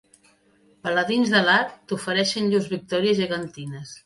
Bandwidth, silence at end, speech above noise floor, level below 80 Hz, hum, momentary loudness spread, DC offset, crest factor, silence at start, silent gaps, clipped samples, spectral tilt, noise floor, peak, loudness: 11.5 kHz; 0.05 s; 37 dB; -64 dBFS; none; 14 LU; under 0.1%; 18 dB; 0.85 s; none; under 0.1%; -4.5 dB/octave; -60 dBFS; -6 dBFS; -22 LUFS